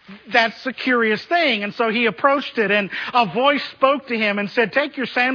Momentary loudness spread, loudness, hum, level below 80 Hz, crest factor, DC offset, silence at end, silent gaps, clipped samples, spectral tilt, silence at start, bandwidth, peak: 3 LU; -19 LUFS; none; -70 dBFS; 18 dB; under 0.1%; 0 s; none; under 0.1%; -5.5 dB/octave; 0.1 s; 5.4 kHz; -2 dBFS